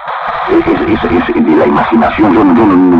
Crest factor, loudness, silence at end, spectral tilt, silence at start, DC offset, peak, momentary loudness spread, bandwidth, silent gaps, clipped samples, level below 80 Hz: 8 dB; -9 LUFS; 0 s; -8.5 dB/octave; 0 s; under 0.1%; 0 dBFS; 5 LU; 5.6 kHz; none; under 0.1%; -32 dBFS